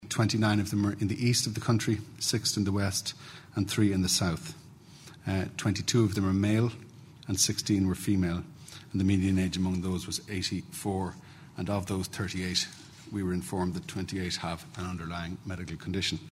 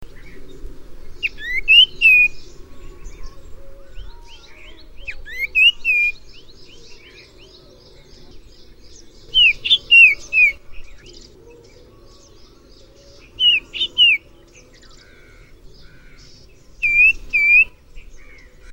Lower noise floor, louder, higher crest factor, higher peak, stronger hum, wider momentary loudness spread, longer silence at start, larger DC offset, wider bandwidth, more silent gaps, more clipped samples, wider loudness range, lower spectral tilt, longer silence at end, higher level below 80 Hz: first, -51 dBFS vs -46 dBFS; second, -30 LUFS vs -12 LUFS; about the same, 18 dB vs 20 dB; second, -12 dBFS vs 0 dBFS; neither; second, 12 LU vs 17 LU; about the same, 0 s vs 0 s; neither; about the same, 16 kHz vs 17.5 kHz; neither; neither; second, 5 LU vs 8 LU; first, -4.5 dB/octave vs -0.5 dB/octave; about the same, 0 s vs 0 s; second, -56 dBFS vs -40 dBFS